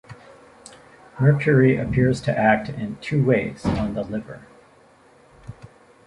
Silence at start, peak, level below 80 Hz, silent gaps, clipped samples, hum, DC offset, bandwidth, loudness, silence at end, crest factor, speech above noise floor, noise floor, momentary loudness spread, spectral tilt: 0.1 s; -2 dBFS; -46 dBFS; none; under 0.1%; none; under 0.1%; 11.5 kHz; -21 LUFS; 0.4 s; 20 dB; 33 dB; -53 dBFS; 24 LU; -8 dB/octave